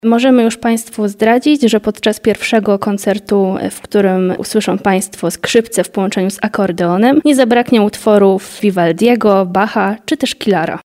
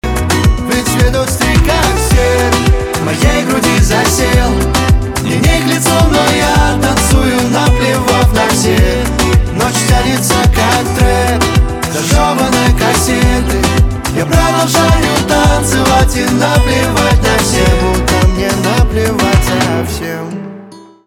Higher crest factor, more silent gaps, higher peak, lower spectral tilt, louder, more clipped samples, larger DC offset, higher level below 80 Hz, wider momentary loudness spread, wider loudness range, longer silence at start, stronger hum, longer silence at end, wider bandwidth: about the same, 12 dB vs 10 dB; neither; about the same, 0 dBFS vs 0 dBFS; about the same, -5 dB/octave vs -4.5 dB/octave; about the same, -13 LUFS vs -11 LUFS; neither; second, under 0.1% vs 0.3%; second, -52 dBFS vs -16 dBFS; first, 6 LU vs 3 LU; about the same, 3 LU vs 1 LU; about the same, 0.05 s vs 0.05 s; neither; second, 0.05 s vs 0.25 s; second, 16 kHz vs 18.5 kHz